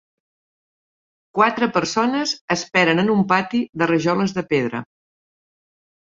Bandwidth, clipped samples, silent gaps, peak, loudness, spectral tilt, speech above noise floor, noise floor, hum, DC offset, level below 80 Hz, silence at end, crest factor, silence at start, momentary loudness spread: 7.8 kHz; under 0.1%; 2.41-2.48 s; -2 dBFS; -19 LUFS; -5 dB/octave; over 71 dB; under -90 dBFS; none; under 0.1%; -60 dBFS; 1.25 s; 20 dB; 1.35 s; 7 LU